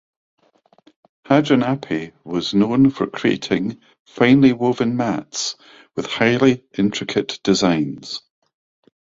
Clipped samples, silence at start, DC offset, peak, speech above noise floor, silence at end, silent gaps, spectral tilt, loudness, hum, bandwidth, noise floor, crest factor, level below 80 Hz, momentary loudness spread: under 0.1%; 1.3 s; under 0.1%; -2 dBFS; 37 dB; 0.9 s; 4.00-4.05 s; -5.5 dB/octave; -19 LUFS; none; 7.8 kHz; -55 dBFS; 18 dB; -54 dBFS; 12 LU